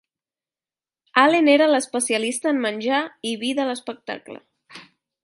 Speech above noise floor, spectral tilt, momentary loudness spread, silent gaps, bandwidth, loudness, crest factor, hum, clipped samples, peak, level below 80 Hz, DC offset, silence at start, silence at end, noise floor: over 69 dB; -2.5 dB/octave; 17 LU; none; 11.5 kHz; -20 LUFS; 22 dB; none; under 0.1%; -2 dBFS; -78 dBFS; under 0.1%; 1.15 s; 0.4 s; under -90 dBFS